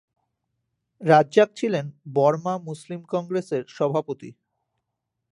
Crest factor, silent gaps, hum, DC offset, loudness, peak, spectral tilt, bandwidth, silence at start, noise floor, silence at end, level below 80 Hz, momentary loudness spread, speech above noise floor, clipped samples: 22 dB; none; none; under 0.1%; -23 LUFS; -2 dBFS; -6.5 dB/octave; 11 kHz; 1 s; -81 dBFS; 1 s; -76 dBFS; 15 LU; 58 dB; under 0.1%